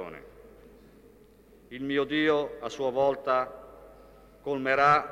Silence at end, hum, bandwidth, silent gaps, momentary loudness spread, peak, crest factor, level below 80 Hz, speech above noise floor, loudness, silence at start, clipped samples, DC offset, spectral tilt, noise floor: 0 s; none; 15.5 kHz; none; 20 LU; -8 dBFS; 20 dB; -60 dBFS; 30 dB; -27 LUFS; 0 s; under 0.1%; under 0.1%; -5.5 dB/octave; -56 dBFS